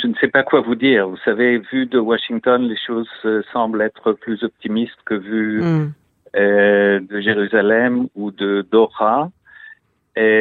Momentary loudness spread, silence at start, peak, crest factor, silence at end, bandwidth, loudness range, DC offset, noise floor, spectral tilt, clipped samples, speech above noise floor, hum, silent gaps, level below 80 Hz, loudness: 9 LU; 0 s; 0 dBFS; 18 dB; 0 s; 4.6 kHz; 4 LU; under 0.1%; -46 dBFS; -8.5 dB/octave; under 0.1%; 29 dB; none; none; -62 dBFS; -17 LUFS